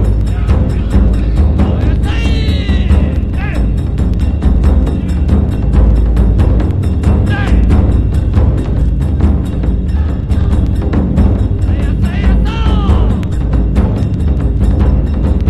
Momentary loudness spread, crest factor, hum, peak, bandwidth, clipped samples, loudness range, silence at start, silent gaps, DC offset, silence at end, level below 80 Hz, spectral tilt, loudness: 4 LU; 10 dB; none; 0 dBFS; 8.6 kHz; under 0.1%; 2 LU; 0 s; none; under 0.1%; 0 s; -12 dBFS; -8.5 dB/octave; -13 LUFS